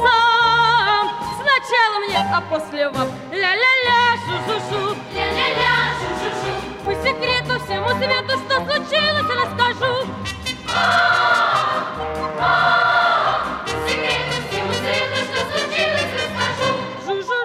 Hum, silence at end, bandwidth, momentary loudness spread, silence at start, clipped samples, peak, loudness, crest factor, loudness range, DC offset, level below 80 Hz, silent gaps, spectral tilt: none; 0 s; 15.5 kHz; 10 LU; 0 s; under 0.1%; -4 dBFS; -18 LUFS; 16 dB; 3 LU; under 0.1%; -46 dBFS; none; -3.5 dB/octave